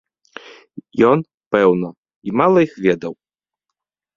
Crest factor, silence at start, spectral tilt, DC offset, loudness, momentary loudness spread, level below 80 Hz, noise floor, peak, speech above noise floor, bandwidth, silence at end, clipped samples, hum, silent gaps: 18 dB; 0.75 s; -8 dB/octave; under 0.1%; -17 LUFS; 19 LU; -58 dBFS; -83 dBFS; 0 dBFS; 67 dB; 7.2 kHz; 1.05 s; under 0.1%; none; 1.34-1.38 s, 1.46-1.51 s, 1.98-2.03 s, 2.16-2.22 s